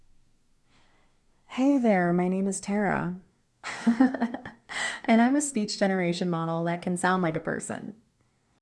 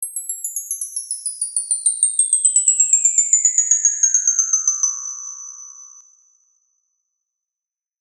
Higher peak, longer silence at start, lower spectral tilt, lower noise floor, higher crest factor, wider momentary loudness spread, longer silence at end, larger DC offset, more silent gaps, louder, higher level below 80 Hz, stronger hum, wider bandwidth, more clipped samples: second, -8 dBFS vs -2 dBFS; first, 1.5 s vs 0 s; first, -5.5 dB/octave vs 11 dB/octave; second, -68 dBFS vs -88 dBFS; about the same, 20 dB vs 18 dB; about the same, 15 LU vs 16 LU; second, 0.65 s vs 2 s; neither; neither; second, -26 LUFS vs -15 LUFS; first, -66 dBFS vs under -90 dBFS; neither; second, 12 kHz vs 14.5 kHz; neither